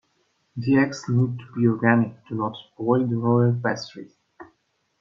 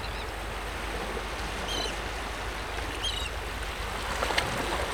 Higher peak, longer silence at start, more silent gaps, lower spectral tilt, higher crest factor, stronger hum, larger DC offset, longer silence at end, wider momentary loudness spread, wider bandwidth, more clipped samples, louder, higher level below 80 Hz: first, -2 dBFS vs -10 dBFS; first, 0.55 s vs 0 s; neither; first, -7.5 dB/octave vs -3 dB/octave; about the same, 22 dB vs 22 dB; neither; second, under 0.1% vs 0.2%; first, 0.55 s vs 0 s; first, 11 LU vs 7 LU; second, 7.4 kHz vs 19.5 kHz; neither; first, -23 LUFS vs -32 LUFS; second, -66 dBFS vs -38 dBFS